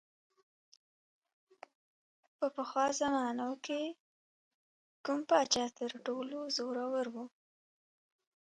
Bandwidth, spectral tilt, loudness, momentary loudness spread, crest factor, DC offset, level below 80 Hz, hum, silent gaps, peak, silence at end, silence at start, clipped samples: 11 kHz; -2 dB/octave; -35 LUFS; 12 LU; 24 dB; under 0.1%; -80 dBFS; none; 4.00-5.04 s; -16 dBFS; 1.2 s; 2.4 s; under 0.1%